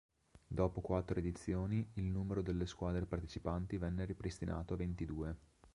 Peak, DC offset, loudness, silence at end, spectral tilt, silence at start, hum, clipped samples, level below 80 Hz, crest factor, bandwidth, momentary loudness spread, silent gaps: -20 dBFS; under 0.1%; -41 LUFS; 0.05 s; -8 dB/octave; 0.35 s; none; under 0.1%; -50 dBFS; 20 dB; 11 kHz; 5 LU; none